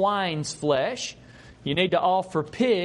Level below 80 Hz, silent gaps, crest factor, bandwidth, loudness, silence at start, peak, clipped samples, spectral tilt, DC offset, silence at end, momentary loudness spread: -58 dBFS; none; 18 dB; 11.5 kHz; -25 LUFS; 0 s; -8 dBFS; under 0.1%; -4.5 dB/octave; under 0.1%; 0 s; 10 LU